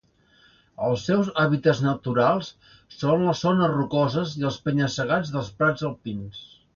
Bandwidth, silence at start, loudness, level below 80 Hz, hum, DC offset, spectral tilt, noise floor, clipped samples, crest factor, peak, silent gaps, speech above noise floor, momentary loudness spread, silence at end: 7.4 kHz; 0.8 s; -24 LUFS; -56 dBFS; none; under 0.1%; -6.5 dB/octave; -59 dBFS; under 0.1%; 18 dB; -6 dBFS; none; 35 dB; 10 LU; 0.3 s